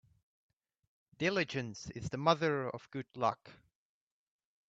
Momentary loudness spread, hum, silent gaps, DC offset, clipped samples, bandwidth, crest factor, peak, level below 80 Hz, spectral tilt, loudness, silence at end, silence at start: 13 LU; none; none; under 0.1%; under 0.1%; 8.2 kHz; 26 dB; -14 dBFS; -70 dBFS; -5.5 dB/octave; -35 LUFS; 1.15 s; 1.2 s